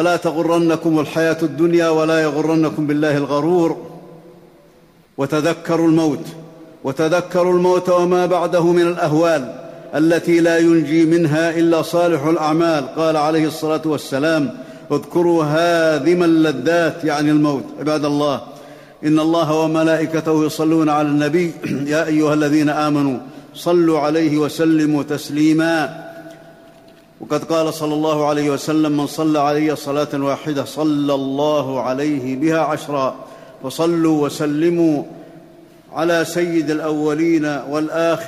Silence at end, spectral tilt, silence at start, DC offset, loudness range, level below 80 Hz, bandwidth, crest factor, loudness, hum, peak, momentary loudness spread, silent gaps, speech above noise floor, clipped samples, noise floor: 0 s; -6 dB/octave; 0 s; under 0.1%; 4 LU; -60 dBFS; 14.5 kHz; 12 dB; -17 LUFS; none; -6 dBFS; 9 LU; none; 33 dB; under 0.1%; -49 dBFS